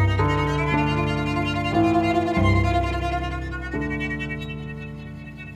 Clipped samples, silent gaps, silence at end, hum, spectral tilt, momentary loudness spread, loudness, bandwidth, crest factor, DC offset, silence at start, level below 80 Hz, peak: under 0.1%; none; 0 s; none; -7 dB/octave; 14 LU; -23 LUFS; 10.5 kHz; 16 dB; under 0.1%; 0 s; -34 dBFS; -6 dBFS